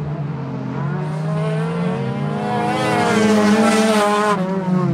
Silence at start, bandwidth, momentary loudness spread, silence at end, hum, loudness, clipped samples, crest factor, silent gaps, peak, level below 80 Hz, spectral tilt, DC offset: 0 s; 15 kHz; 10 LU; 0 s; none; -18 LUFS; under 0.1%; 14 dB; none; -4 dBFS; -54 dBFS; -6 dB/octave; under 0.1%